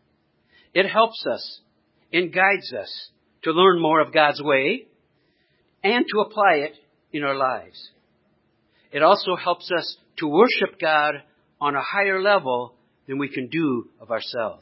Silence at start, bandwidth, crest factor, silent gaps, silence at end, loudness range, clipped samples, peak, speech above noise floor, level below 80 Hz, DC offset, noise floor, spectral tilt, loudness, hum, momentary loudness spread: 0.75 s; 5.8 kHz; 22 dB; none; 0.05 s; 4 LU; under 0.1%; -2 dBFS; 45 dB; -74 dBFS; under 0.1%; -66 dBFS; -9 dB/octave; -21 LUFS; none; 14 LU